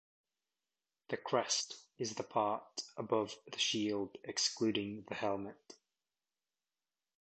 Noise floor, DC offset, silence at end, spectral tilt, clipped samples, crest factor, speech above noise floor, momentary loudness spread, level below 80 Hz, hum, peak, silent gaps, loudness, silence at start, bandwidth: under -90 dBFS; under 0.1%; 1.5 s; -2.5 dB/octave; under 0.1%; 22 dB; over 52 dB; 10 LU; -78 dBFS; none; -18 dBFS; none; -37 LUFS; 1.1 s; 8.8 kHz